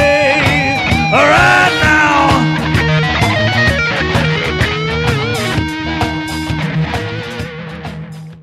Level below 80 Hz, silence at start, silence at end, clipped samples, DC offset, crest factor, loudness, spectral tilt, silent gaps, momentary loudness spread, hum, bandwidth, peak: -30 dBFS; 0 s; 0 s; under 0.1%; under 0.1%; 12 dB; -12 LUFS; -5 dB/octave; none; 14 LU; none; 15 kHz; 0 dBFS